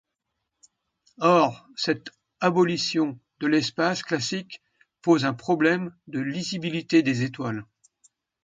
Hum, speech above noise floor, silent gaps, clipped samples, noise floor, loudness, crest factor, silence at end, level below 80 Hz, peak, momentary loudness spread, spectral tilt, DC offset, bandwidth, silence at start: none; 57 dB; none; under 0.1%; -81 dBFS; -25 LUFS; 20 dB; 0.85 s; -68 dBFS; -6 dBFS; 11 LU; -5 dB/octave; under 0.1%; 9.2 kHz; 1.2 s